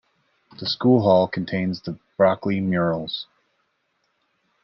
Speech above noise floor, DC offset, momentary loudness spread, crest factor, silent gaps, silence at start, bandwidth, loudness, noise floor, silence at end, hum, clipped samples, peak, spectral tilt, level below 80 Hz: 50 dB; under 0.1%; 14 LU; 18 dB; none; 0.6 s; 6.2 kHz; -22 LUFS; -71 dBFS; 1.4 s; none; under 0.1%; -4 dBFS; -8.5 dB/octave; -64 dBFS